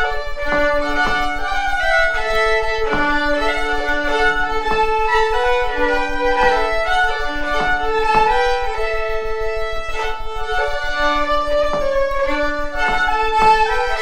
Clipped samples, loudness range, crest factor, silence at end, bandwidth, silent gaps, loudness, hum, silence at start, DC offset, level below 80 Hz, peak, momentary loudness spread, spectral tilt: under 0.1%; 3 LU; 14 dB; 0 s; 10.5 kHz; none; -18 LUFS; none; 0 s; under 0.1%; -28 dBFS; -2 dBFS; 7 LU; -3.5 dB/octave